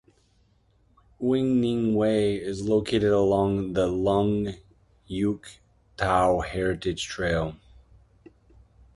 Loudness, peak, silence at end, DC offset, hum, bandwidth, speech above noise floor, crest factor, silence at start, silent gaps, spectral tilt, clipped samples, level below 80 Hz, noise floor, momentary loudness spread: -25 LUFS; -8 dBFS; 1.4 s; under 0.1%; none; 11.5 kHz; 39 dB; 18 dB; 1.2 s; none; -6.5 dB/octave; under 0.1%; -46 dBFS; -64 dBFS; 8 LU